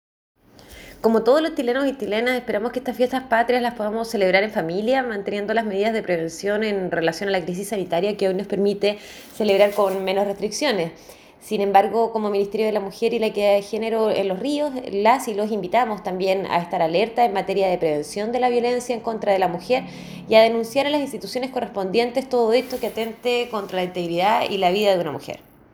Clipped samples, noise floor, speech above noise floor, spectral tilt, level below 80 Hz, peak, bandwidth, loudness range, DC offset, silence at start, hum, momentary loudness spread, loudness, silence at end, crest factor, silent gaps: under 0.1%; -45 dBFS; 24 dB; -5 dB/octave; -58 dBFS; -2 dBFS; over 20 kHz; 2 LU; under 0.1%; 0.7 s; none; 8 LU; -21 LUFS; 0.35 s; 20 dB; none